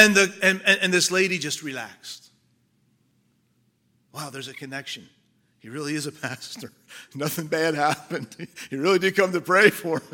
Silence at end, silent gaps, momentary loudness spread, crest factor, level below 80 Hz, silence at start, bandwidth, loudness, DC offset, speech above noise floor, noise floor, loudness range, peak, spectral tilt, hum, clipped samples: 0.1 s; none; 21 LU; 24 dB; -74 dBFS; 0 s; 17 kHz; -22 LUFS; under 0.1%; 43 dB; -67 dBFS; 16 LU; 0 dBFS; -3 dB/octave; none; under 0.1%